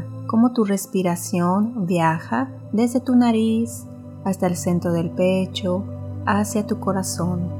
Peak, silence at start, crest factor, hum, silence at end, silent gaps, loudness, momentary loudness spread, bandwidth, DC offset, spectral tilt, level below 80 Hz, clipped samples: -6 dBFS; 0 s; 16 dB; none; 0 s; none; -21 LUFS; 8 LU; 17.5 kHz; under 0.1%; -6 dB/octave; -66 dBFS; under 0.1%